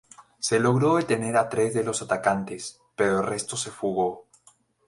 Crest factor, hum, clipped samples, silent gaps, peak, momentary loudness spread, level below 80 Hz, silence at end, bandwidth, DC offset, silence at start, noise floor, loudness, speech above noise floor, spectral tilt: 18 dB; none; under 0.1%; none; -8 dBFS; 9 LU; -62 dBFS; 0.65 s; 11.5 kHz; under 0.1%; 0.2 s; -60 dBFS; -25 LUFS; 36 dB; -4.5 dB/octave